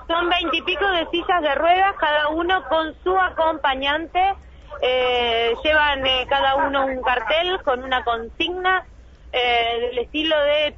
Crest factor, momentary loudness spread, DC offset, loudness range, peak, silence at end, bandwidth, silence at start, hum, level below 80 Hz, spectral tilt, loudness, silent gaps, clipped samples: 14 dB; 6 LU; under 0.1%; 2 LU; -6 dBFS; 0 s; 7 kHz; 0 s; none; -42 dBFS; -4.5 dB/octave; -20 LUFS; none; under 0.1%